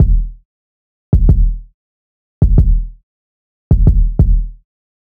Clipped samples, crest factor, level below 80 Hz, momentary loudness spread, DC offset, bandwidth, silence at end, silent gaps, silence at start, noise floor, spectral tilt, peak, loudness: under 0.1%; 14 dB; -14 dBFS; 17 LU; under 0.1%; 1.4 kHz; 0.65 s; 0.45-1.12 s, 1.74-2.41 s, 3.03-3.71 s; 0 s; under -90 dBFS; -12.5 dB/octave; 0 dBFS; -15 LUFS